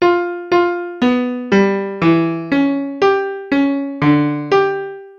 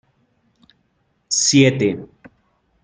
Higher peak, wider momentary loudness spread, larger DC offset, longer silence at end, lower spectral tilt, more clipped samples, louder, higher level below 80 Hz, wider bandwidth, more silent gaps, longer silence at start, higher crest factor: about the same, 0 dBFS vs -2 dBFS; second, 5 LU vs 10 LU; neither; second, 0.05 s vs 0.8 s; first, -7.5 dB/octave vs -4 dB/octave; neither; about the same, -16 LUFS vs -16 LUFS; first, -52 dBFS vs -60 dBFS; second, 7 kHz vs 10 kHz; neither; second, 0 s vs 1.3 s; second, 14 dB vs 20 dB